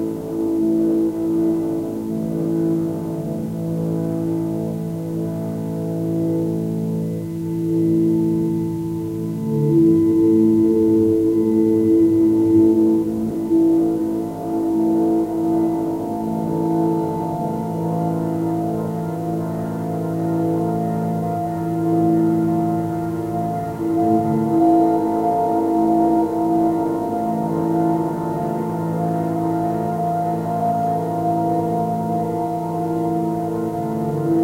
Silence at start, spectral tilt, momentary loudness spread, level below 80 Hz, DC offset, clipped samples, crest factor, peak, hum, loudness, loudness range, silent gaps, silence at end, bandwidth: 0 s; -9.5 dB/octave; 9 LU; -52 dBFS; under 0.1%; under 0.1%; 14 dB; -6 dBFS; none; -20 LUFS; 7 LU; none; 0 s; 16 kHz